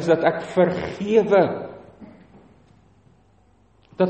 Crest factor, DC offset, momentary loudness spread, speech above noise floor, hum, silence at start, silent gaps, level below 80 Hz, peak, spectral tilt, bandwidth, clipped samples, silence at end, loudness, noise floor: 18 dB; under 0.1%; 17 LU; 38 dB; none; 0 s; none; -56 dBFS; -4 dBFS; -7 dB/octave; 8.4 kHz; under 0.1%; 0 s; -20 LUFS; -58 dBFS